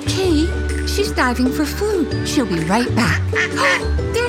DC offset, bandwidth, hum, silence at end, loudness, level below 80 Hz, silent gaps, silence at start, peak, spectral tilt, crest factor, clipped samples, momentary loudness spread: under 0.1%; 16.5 kHz; none; 0 s; -18 LUFS; -28 dBFS; none; 0 s; -4 dBFS; -5 dB/octave; 14 dB; under 0.1%; 4 LU